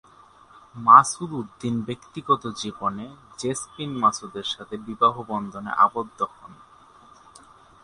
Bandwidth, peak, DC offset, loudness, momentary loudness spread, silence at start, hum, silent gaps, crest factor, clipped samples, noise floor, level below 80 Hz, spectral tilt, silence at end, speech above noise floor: 11.5 kHz; 0 dBFS; under 0.1%; -23 LUFS; 18 LU; 0.75 s; none; none; 24 dB; under 0.1%; -52 dBFS; -62 dBFS; -4 dB/octave; 1.3 s; 29 dB